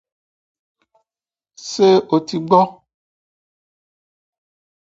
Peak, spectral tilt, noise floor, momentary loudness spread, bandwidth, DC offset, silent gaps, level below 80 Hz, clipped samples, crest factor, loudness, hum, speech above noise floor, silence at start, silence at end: 0 dBFS; -6 dB/octave; under -90 dBFS; 13 LU; 8 kHz; under 0.1%; none; -66 dBFS; under 0.1%; 22 dB; -16 LUFS; none; over 75 dB; 1.6 s; 2.15 s